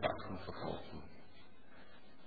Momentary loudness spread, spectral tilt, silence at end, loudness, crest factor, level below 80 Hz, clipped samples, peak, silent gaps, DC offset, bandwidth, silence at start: 18 LU; -4 dB/octave; 0 s; -45 LUFS; 24 dB; -64 dBFS; under 0.1%; -22 dBFS; none; 0.4%; 4.9 kHz; 0 s